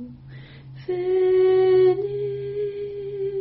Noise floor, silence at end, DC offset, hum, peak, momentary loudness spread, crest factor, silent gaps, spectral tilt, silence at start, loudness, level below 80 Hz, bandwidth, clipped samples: -42 dBFS; 0 s; under 0.1%; none; -10 dBFS; 25 LU; 12 dB; none; -6.5 dB/octave; 0 s; -22 LUFS; -56 dBFS; 4.7 kHz; under 0.1%